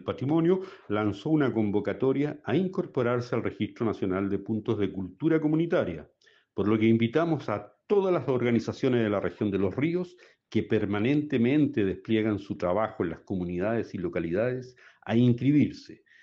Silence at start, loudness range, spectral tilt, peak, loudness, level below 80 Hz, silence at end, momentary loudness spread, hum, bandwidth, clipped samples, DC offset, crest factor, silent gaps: 0 s; 2 LU; -8.5 dB/octave; -12 dBFS; -28 LUFS; -62 dBFS; 0.3 s; 8 LU; none; 7.2 kHz; under 0.1%; under 0.1%; 16 dB; none